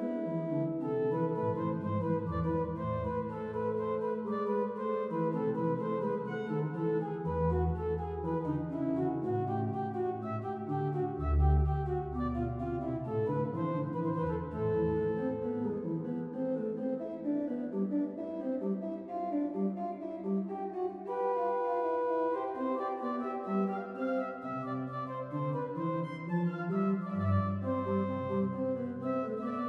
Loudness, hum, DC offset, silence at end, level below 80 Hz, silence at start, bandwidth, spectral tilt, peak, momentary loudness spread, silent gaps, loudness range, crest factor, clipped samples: -34 LUFS; none; under 0.1%; 0 s; -44 dBFS; 0 s; 5.6 kHz; -10.5 dB/octave; -18 dBFS; 5 LU; none; 2 LU; 16 dB; under 0.1%